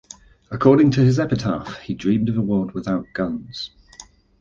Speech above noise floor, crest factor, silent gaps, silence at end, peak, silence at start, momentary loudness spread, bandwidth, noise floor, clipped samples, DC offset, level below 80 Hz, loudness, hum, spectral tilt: 27 dB; 18 dB; none; 0.4 s; -2 dBFS; 0.5 s; 17 LU; 7.6 kHz; -46 dBFS; under 0.1%; under 0.1%; -48 dBFS; -20 LUFS; none; -7.5 dB/octave